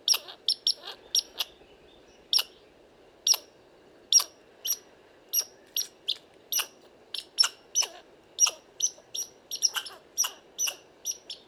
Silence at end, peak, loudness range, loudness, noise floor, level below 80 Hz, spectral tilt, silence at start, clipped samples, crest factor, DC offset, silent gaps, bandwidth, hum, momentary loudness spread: 0.1 s; -8 dBFS; 2 LU; -28 LUFS; -57 dBFS; -74 dBFS; 3.5 dB/octave; 0.05 s; under 0.1%; 24 dB; under 0.1%; none; over 20 kHz; none; 12 LU